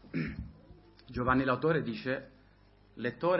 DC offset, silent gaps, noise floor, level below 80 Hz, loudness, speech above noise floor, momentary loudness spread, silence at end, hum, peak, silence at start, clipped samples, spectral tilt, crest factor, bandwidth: under 0.1%; none; -61 dBFS; -52 dBFS; -33 LUFS; 31 dB; 15 LU; 0 s; 50 Hz at -65 dBFS; -12 dBFS; 0.05 s; under 0.1%; -10.5 dB/octave; 22 dB; 5.8 kHz